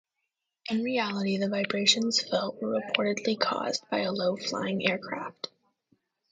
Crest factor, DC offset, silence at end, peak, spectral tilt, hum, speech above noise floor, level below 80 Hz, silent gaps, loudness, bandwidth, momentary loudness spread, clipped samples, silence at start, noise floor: 24 dB; under 0.1%; 0.85 s; -6 dBFS; -3.5 dB/octave; none; 55 dB; -76 dBFS; none; -28 LUFS; 9.4 kHz; 12 LU; under 0.1%; 0.65 s; -83 dBFS